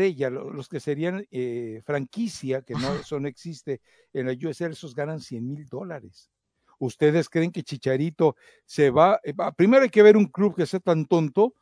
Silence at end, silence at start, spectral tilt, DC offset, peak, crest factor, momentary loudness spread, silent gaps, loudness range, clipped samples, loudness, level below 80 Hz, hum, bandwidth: 0.1 s; 0 s; -7 dB/octave; under 0.1%; -4 dBFS; 20 dB; 17 LU; none; 12 LU; under 0.1%; -24 LUFS; -64 dBFS; none; 11 kHz